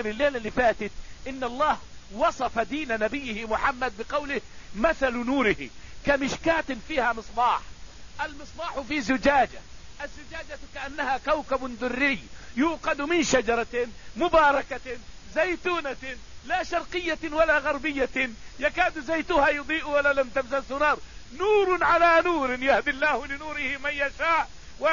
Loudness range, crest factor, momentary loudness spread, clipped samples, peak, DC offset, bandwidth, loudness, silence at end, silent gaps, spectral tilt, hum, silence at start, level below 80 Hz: 5 LU; 18 dB; 14 LU; under 0.1%; -8 dBFS; 0.6%; 7.4 kHz; -25 LUFS; 0 s; none; -4 dB/octave; none; 0 s; -46 dBFS